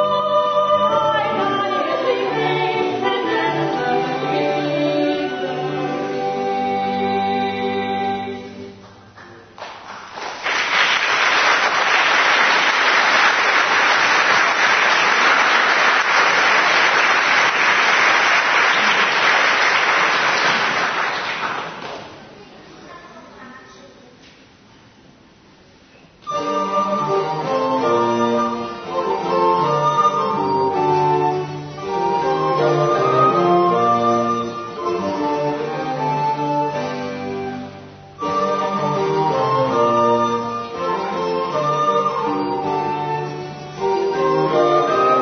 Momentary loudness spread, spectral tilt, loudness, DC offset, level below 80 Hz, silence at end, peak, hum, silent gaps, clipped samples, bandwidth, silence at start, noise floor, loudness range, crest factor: 12 LU; -3.5 dB/octave; -17 LUFS; under 0.1%; -60 dBFS; 0 s; -2 dBFS; none; none; under 0.1%; 6.6 kHz; 0 s; -48 dBFS; 9 LU; 16 dB